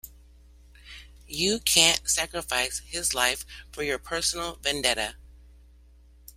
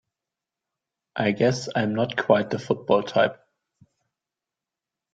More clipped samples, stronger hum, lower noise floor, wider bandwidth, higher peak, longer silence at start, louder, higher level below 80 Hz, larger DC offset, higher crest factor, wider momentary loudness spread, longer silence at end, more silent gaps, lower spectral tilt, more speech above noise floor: neither; neither; second, -54 dBFS vs -88 dBFS; first, 16 kHz vs 9 kHz; about the same, -2 dBFS vs -4 dBFS; second, 0.05 s vs 1.15 s; about the same, -25 LUFS vs -23 LUFS; first, -48 dBFS vs -64 dBFS; neither; first, 28 dB vs 22 dB; first, 20 LU vs 6 LU; second, 1 s vs 1.8 s; neither; second, -0.5 dB/octave vs -6 dB/octave; second, 27 dB vs 66 dB